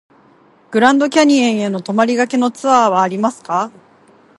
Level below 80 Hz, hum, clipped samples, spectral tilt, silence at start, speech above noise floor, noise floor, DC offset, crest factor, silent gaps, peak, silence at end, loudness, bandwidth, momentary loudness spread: -66 dBFS; none; under 0.1%; -4.5 dB/octave; 0.7 s; 36 dB; -49 dBFS; under 0.1%; 16 dB; none; 0 dBFS; 0.7 s; -14 LUFS; 11.5 kHz; 9 LU